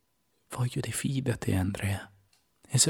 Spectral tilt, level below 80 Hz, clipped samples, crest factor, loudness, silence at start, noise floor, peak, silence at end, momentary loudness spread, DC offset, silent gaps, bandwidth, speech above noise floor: -4 dB/octave; -58 dBFS; under 0.1%; 22 dB; -31 LUFS; 0.5 s; -74 dBFS; -10 dBFS; 0 s; 9 LU; under 0.1%; none; 18 kHz; 44 dB